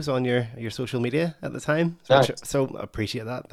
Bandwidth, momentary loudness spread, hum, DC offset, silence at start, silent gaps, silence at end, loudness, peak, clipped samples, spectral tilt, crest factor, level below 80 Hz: 15 kHz; 12 LU; none; under 0.1%; 0 s; none; 0.1 s; -25 LUFS; -4 dBFS; under 0.1%; -5.5 dB/octave; 22 dB; -54 dBFS